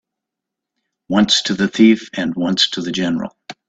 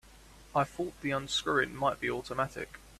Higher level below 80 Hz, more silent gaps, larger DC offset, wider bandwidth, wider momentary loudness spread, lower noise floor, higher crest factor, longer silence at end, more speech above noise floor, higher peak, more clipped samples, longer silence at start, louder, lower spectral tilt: about the same, -54 dBFS vs -58 dBFS; neither; neither; second, 8 kHz vs 14.5 kHz; about the same, 9 LU vs 7 LU; first, -82 dBFS vs -55 dBFS; about the same, 18 dB vs 20 dB; first, 0.15 s vs 0 s; first, 67 dB vs 23 dB; first, 0 dBFS vs -14 dBFS; neither; first, 1.1 s vs 0.05 s; first, -16 LUFS vs -32 LUFS; about the same, -4 dB/octave vs -4 dB/octave